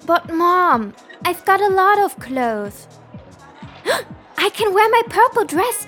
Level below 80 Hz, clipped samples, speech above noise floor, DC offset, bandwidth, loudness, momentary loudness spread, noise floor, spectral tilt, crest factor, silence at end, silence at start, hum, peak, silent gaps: -54 dBFS; under 0.1%; 23 dB; under 0.1%; 19 kHz; -17 LUFS; 11 LU; -40 dBFS; -3.5 dB/octave; 16 dB; 0 s; 0.05 s; none; -2 dBFS; none